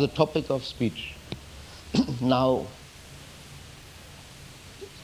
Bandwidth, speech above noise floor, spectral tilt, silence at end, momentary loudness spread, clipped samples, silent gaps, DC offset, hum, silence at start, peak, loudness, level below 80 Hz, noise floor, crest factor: 16 kHz; 21 dB; -6 dB/octave; 0 s; 22 LU; under 0.1%; none; under 0.1%; none; 0 s; -6 dBFS; -27 LUFS; -50 dBFS; -46 dBFS; 24 dB